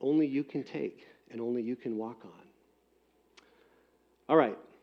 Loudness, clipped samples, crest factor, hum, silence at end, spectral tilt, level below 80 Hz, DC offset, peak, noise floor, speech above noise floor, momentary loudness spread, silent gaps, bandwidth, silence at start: -32 LUFS; under 0.1%; 22 dB; none; 0.2 s; -8.5 dB/octave; -82 dBFS; under 0.1%; -12 dBFS; -70 dBFS; 38 dB; 18 LU; none; 6.4 kHz; 0 s